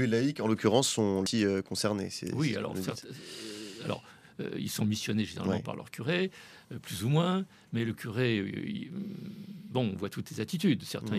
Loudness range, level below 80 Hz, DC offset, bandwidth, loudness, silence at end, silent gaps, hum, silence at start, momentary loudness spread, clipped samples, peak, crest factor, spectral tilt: 5 LU; -70 dBFS; under 0.1%; 14.5 kHz; -32 LUFS; 0 s; none; none; 0 s; 14 LU; under 0.1%; -10 dBFS; 22 dB; -5 dB/octave